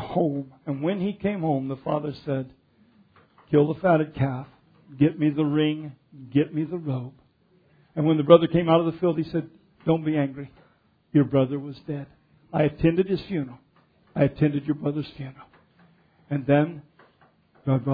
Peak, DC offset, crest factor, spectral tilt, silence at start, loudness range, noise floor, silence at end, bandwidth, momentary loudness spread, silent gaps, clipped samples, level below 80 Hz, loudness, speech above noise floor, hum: -2 dBFS; under 0.1%; 24 dB; -11 dB/octave; 0 s; 6 LU; -62 dBFS; 0 s; 5 kHz; 15 LU; none; under 0.1%; -56 dBFS; -24 LUFS; 39 dB; none